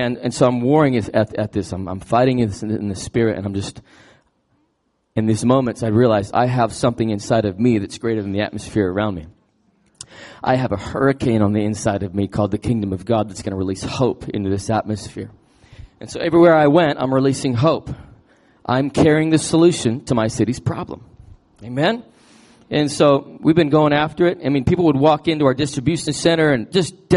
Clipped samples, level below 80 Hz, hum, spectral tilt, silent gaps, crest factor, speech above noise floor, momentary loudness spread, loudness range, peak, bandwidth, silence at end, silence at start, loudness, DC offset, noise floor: under 0.1%; -48 dBFS; none; -6 dB/octave; none; 16 dB; 50 dB; 12 LU; 6 LU; -2 dBFS; 11.5 kHz; 0 s; 0 s; -18 LUFS; under 0.1%; -67 dBFS